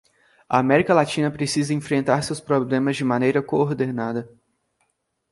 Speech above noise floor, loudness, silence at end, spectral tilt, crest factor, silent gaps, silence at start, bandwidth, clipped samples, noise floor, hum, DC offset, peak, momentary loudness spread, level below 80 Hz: 51 dB; -21 LUFS; 1.05 s; -6 dB/octave; 20 dB; none; 0.5 s; 11.5 kHz; under 0.1%; -72 dBFS; none; under 0.1%; -2 dBFS; 7 LU; -60 dBFS